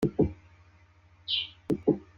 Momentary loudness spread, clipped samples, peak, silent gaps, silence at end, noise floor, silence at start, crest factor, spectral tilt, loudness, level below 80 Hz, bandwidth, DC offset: 14 LU; under 0.1%; -10 dBFS; none; 0.15 s; -59 dBFS; 0 s; 20 dB; -7 dB/octave; -30 LUFS; -52 dBFS; 16 kHz; under 0.1%